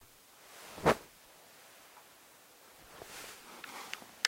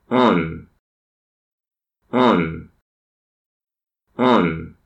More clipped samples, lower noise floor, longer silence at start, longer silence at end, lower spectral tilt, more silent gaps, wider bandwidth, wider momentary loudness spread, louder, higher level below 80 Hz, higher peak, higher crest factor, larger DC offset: neither; second, -60 dBFS vs under -90 dBFS; about the same, 0 s vs 0.1 s; second, 0 s vs 0.15 s; second, -3 dB/octave vs -7.5 dB/octave; second, none vs 0.79-1.58 s, 2.82-3.60 s; first, 16 kHz vs 8.2 kHz; first, 25 LU vs 20 LU; second, -38 LUFS vs -18 LUFS; second, -64 dBFS vs -50 dBFS; second, -8 dBFS vs -4 dBFS; first, 32 dB vs 18 dB; neither